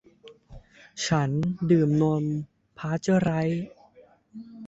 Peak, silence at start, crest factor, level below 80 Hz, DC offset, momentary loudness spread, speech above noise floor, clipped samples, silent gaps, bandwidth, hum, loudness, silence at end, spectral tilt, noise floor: -10 dBFS; 0.25 s; 18 dB; -56 dBFS; under 0.1%; 21 LU; 32 dB; under 0.1%; none; 8 kHz; none; -25 LUFS; 0 s; -6.5 dB/octave; -56 dBFS